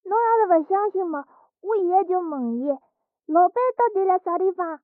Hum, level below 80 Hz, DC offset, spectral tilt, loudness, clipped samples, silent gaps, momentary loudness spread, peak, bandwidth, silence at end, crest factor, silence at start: none; -78 dBFS; under 0.1%; -6 dB/octave; -22 LUFS; under 0.1%; none; 9 LU; -8 dBFS; 2.8 kHz; 0.1 s; 14 dB; 0.05 s